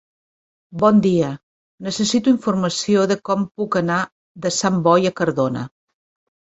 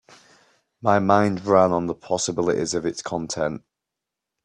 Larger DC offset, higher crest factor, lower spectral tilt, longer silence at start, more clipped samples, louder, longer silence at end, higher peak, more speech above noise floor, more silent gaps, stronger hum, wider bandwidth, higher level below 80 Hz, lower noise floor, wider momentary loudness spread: neither; about the same, 18 dB vs 22 dB; about the same, -5 dB/octave vs -5 dB/octave; second, 0.7 s vs 0.85 s; neither; first, -19 LUFS vs -22 LUFS; about the same, 0.85 s vs 0.85 s; about the same, -2 dBFS vs -2 dBFS; first, over 72 dB vs 64 dB; first, 1.43-1.78 s, 4.12-4.35 s vs none; neither; second, 8.2 kHz vs 11 kHz; about the same, -58 dBFS vs -60 dBFS; first, under -90 dBFS vs -85 dBFS; first, 13 LU vs 10 LU